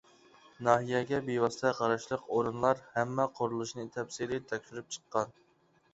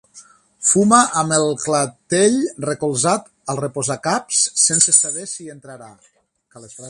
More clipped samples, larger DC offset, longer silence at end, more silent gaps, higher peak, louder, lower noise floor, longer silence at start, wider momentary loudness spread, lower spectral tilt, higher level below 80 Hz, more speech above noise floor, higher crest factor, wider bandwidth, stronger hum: neither; neither; first, 0.6 s vs 0 s; neither; second, -10 dBFS vs 0 dBFS; second, -33 LUFS vs -16 LUFS; first, -69 dBFS vs -47 dBFS; first, 0.6 s vs 0.15 s; second, 10 LU vs 13 LU; first, -5 dB/octave vs -3 dB/octave; second, -68 dBFS vs -62 dBFS; first, 37 dB vs 29 dB; about the same, 24 dB vs 20 dB; second, 8.2 kHz vs 11.5 kHz; neither